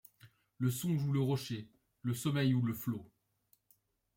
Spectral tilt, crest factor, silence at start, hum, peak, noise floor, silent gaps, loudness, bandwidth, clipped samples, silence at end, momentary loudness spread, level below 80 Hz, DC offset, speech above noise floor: -6.5 dB/octave; 16 dB; 0.25 s; none; -22 dBFS; -75 dBFS; none; -36 LUFS; 17 kHz; under 0.1%; 1.1 s; 11 LU; -72 dBFS; under 0.1%; 41 dB